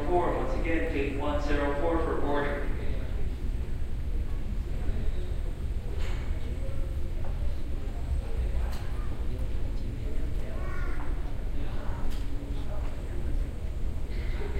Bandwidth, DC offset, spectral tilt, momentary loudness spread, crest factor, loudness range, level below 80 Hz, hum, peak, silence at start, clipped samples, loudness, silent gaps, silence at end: 8.8 kHz; under 0.1%; -7.5 dB/octave; 7 LU; 14 dB; 6 LU; -30 dBFS; none; -14 dBFS; 0 s; under 0.1%; -34 LUFS; none; 0 s